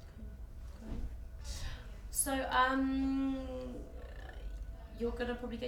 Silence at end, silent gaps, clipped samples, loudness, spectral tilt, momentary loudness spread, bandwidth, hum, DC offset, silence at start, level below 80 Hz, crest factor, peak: 0 s; none; under 0.1%; -36 LUFS; -4 dB/octave; 19 LU; 18.5 kHz; none; under 0.1%; 0 s; -46 dBFS; 18 dB; -20 dBFS